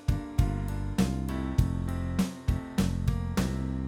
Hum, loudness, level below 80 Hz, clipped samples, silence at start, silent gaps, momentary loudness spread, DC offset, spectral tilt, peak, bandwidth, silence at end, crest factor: none; -30 LUFS; -34 dBFS; under 0.1%; 0 s; none; 3 LU; under 0.1%; -6.5 dB/octave; -10 dBFS; 17.5 kHz; 0 s; 20 dB